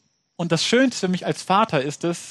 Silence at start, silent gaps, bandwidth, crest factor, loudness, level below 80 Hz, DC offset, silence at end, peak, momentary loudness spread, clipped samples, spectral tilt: 0.4 s; none; 12.5 kHz; 18 dB; -21 LUFS; -66 dBFS; under 0.1%; 0 s; -4 dBFS; 8 LU; under 0.1%; -4.5 dB/octave